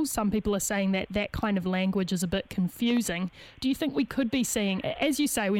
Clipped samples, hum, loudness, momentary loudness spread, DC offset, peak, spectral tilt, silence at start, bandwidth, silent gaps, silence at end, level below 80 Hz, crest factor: under 0.1%; none; -28 LUFS; 4 LU; under 0.1%; -12 dBFS; -4.5 dB/octave; 0 s; 17 kHz; none; 0 s; -50 dBFS; 16 dB